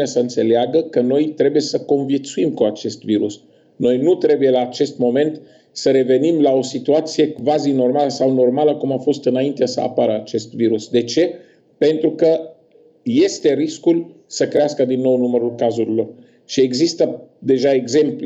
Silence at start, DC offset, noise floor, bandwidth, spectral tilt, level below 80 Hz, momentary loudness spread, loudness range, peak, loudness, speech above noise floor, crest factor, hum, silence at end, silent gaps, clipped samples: 0 s; under 0.1%; -51 dBFS; 8.2 kHz; -5.5 dB/octave; -66 dBFS; 6 LU; 2 LU; -6 dBFS; -17 LUFS; 34 dB; 12 dB; none; 0 s; none; under 0.1%